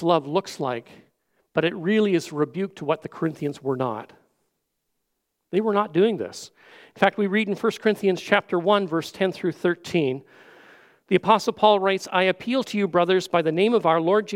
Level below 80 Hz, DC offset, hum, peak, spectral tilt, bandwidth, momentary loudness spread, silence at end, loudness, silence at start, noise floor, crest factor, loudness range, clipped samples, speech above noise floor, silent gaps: -72 dBFS; under 0.1%; none; 0 dBFS; -5.5 dB/octave; 16 kHz; 10 LU; 0 s; -23 LUFS; 0 s; -77 dBFS; 22 dB; 6 LU; under 0.1%; 55 dB; none